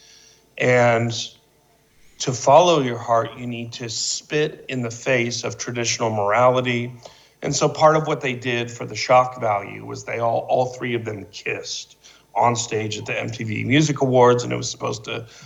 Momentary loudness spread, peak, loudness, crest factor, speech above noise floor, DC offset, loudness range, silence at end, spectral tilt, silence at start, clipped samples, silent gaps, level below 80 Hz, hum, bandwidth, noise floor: 13 LU; 0 dBFS; -21 LUFS; 20 dB; 38 dB; under 0.1%; 4 LU; 0 s; -4.5 dB/octave; 0.55 s; under 0.1%; none; -60 dBFS; none; 11 kHz; -58 dBFS